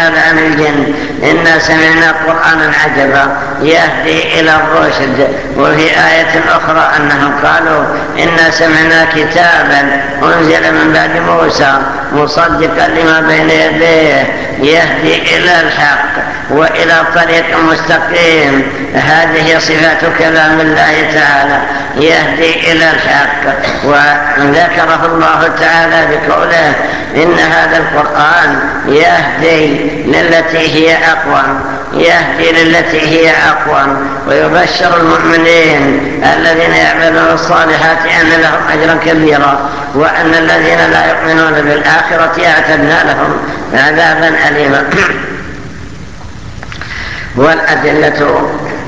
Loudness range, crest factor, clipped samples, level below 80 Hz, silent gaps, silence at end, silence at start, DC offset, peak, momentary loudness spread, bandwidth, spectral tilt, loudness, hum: 1 LU; 8 dB; 1%; -34 dBFS; none; 0 s; 0 s; 3%; 0 dBFS; 6 LU; 8 kHz; -4.5 dB/octave; -7 LUFS; none